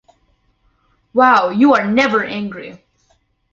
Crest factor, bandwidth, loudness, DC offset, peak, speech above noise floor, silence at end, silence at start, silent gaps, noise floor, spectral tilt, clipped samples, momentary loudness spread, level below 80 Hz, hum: 16 dB; 7.4 kHz; -14 LUFS; under 0.1%; -2 dBFS; 46 dB; 0.75 s; 1.15 s; none; -60 dBFS; -5.5 dB/octave; under 0.1%; 17 LU; -58 dBFS; none